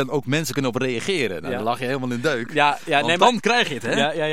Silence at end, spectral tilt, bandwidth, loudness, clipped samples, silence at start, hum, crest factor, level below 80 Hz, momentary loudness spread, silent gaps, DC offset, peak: 0 s; -4 dB/octave; 16.5 kHz; -21 LUFS; under 0.1%; 0 s; none; 20 dB; -62 dBFS; 8 LU; none; 1%; -2 dBFS